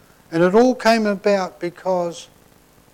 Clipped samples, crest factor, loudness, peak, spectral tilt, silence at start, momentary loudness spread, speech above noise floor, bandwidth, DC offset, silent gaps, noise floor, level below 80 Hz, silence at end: under 0.1%; 14 dB; -19 LUFS; -6 dBFS; -5.5 dB/octave; 0.3 s; 12 LU; 34 dB; 16.5 kHz; under 0.1%; none; -52 dBFS; -56 dBFS; 0.7 s